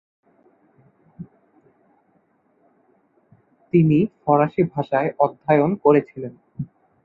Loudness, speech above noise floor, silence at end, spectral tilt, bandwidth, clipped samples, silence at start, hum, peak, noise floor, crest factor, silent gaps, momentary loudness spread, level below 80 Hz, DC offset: -19 LUFS; 44 dB; 0.4 s; -11 dB/octave; 4.6 kHz; under 0.1%; 1.2 s; none; -2 dBFS; -63 dBFS; 20 dB; none; 21 LU; -60 dBFS; under 0.1%